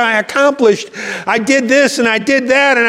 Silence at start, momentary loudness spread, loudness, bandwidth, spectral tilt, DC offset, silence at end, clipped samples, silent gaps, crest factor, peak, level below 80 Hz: 0 s; 7 LU; -12 LUFS; 15 kHz; -3 dB/octave; under 0.1%; 0 s; under 0.1%; none; 12 dB; 0 dBFS; -60 dBFS